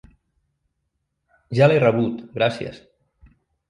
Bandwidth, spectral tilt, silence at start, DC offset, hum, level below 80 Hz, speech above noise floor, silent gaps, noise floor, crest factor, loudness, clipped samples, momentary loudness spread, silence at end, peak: 10.5 kHz; -7.5 dB/octave; 1.5 s; under 0.1%; none; -58 dBFS; 56 dB; none; -76 dBFS; 20 dB; -19 LUFS; under 0.1%; 15 LU; 0.95 s; -2 dBFS